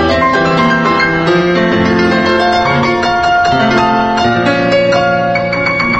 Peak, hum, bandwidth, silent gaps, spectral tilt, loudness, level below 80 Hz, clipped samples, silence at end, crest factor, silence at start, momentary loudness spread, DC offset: 0 dBFS; none; 8.6 kHz; none; -5.5 dB/octave; -11 LUFS; -36 dBFS; under 0.1%; 0 s; 10 dB; 0 s; 2 LU; under 0.1%